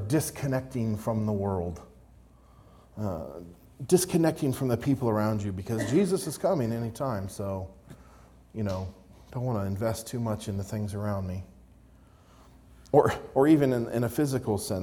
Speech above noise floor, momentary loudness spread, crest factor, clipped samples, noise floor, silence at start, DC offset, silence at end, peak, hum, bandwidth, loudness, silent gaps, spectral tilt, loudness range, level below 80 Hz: 28 dB; 14 LU; 22 dB; under 0.1%; -56 dBFS; 0 s; under 0.1%; 0 s; -6 dBFS; none; 18 kHz; -28 LUFS; none; -6.5 dB/octave; 7 LU; -56 dBFS